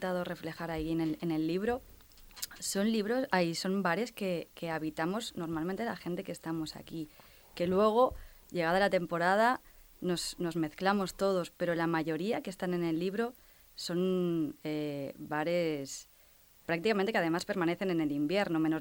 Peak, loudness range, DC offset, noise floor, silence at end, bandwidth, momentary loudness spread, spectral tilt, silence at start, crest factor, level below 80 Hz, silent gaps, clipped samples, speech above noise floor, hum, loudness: -14 dBFS; 4 LU; under 0.1%; -61 dBFS; 0 s; over 20 kHz; 11 LU; -5 dB/octave; 0 s; 20 dB; -60 dBFS; none; under 0.1%; 29 dB; none; -33 LUFS